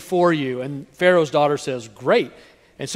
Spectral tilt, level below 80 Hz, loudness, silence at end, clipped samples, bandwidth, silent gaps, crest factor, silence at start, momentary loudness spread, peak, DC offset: -5.5 dB/octave; -62 dBFS; -20 LUFS; 0 s; under 0.1%; 15 kHz; none; 18 dB; 0 s; 14 LU; -2 dBFS; under 0.1%